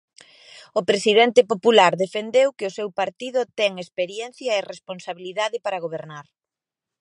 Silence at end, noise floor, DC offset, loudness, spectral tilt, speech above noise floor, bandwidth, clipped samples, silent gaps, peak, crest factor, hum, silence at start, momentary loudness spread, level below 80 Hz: 0.8 s; -89 dBFS; under 0.1%; -21 LUFS; -3.5 dB/octave; 67 dB; 11 kHz; under 0.1%; none; 0 dBFS; 22 dB; none; 0.55 s; 17 LU; -76 dBFS